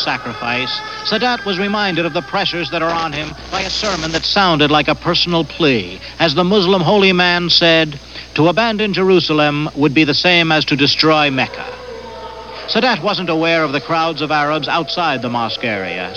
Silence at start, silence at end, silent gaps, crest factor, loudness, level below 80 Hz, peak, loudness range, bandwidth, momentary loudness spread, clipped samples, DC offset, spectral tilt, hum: 0 s; 0 s; none; 16 dB; -14 LUFS; -42 dBFS; 0 dBFS; 5 LU; 9.2 kHz; 10 LU; under 0.1%; 0.2%; -5 dB/octave; none